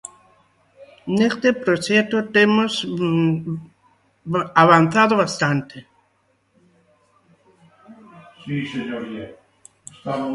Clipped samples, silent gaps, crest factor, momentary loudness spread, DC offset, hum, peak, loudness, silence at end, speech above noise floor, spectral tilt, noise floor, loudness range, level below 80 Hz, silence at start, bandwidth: under 0.1%; none; 22 dB; 21 LU; under 0.1%; none; 0 dBFS; -19 LUFS; 0 s; 45 dB; -5.5 dB/octave; -64 dBFS; 15 LU; -62 dBFS; 0.05 s; 11.5 kHz